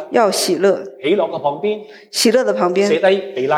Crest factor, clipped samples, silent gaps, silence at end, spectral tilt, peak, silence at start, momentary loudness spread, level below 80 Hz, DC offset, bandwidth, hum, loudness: 14 dB; under 0.1%; none; 0 s; -3.5 dB/octave; -2 dBFS; 0 s; 8 LU; -72 dBFS; under 0.1%; 16.5 kHz; none; -16 LUFS